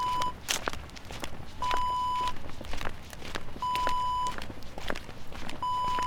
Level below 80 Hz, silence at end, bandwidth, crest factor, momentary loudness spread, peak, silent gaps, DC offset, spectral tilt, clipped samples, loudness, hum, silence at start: -42 dBFS; 0 s; 18.5 kHz; 24 dB; 13 LU; -6 dBFS; none; under 0.1%; -2.5 dB/octave; under 0.1%; -33 LUFS; none; 0 s